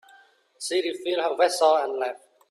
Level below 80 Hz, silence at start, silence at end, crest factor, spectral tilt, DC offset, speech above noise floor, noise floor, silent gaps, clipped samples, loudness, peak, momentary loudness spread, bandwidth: -78 dBFS; 0.6 s; 0.35 s; 18 dB; -1 dB/octave; under 0.1%; 33 dB; -57 dBFS; none; under 0.1%; -24 LUFS; -8 dBFS; 12 LU; 13 kHz